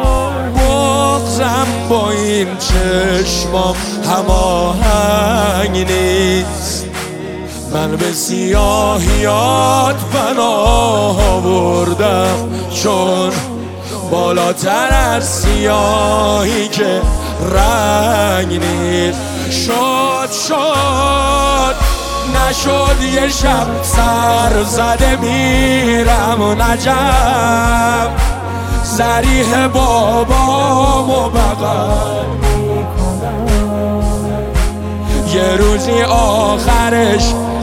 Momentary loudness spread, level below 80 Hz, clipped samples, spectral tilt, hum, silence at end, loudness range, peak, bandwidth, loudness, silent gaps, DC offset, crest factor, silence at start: 6 LU; -20 dBFS; under 0.1%; -4.5 dB/octave; none; 0 s; 3 LU; 0 dBFS; 16.5 kHz; -13 LUFS; none; 0.2%; 12 dB; 0 s